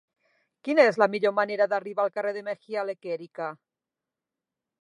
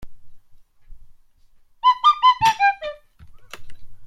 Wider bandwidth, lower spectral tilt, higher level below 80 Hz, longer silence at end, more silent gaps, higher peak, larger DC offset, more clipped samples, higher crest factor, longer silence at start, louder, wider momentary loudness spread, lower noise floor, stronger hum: second, 10.5 kHz vs 15.5 kHz; first, -5.5 dB/octave vs -1 dB/octave; second, -86 dBFS vs -48 dBFS; first, 1.25 s vs 0 s; neither; about the same, -6 dBFS vs -6 dBFS; neither; neither; about the same, 22 dB vs 18 dB; first, 0.65 s vs 0 s; second, -26 LUFS vs -17 LUFS; about the same, 15 LU vs 13 LU; first, -89 dBFS vs -52 dBFS; neither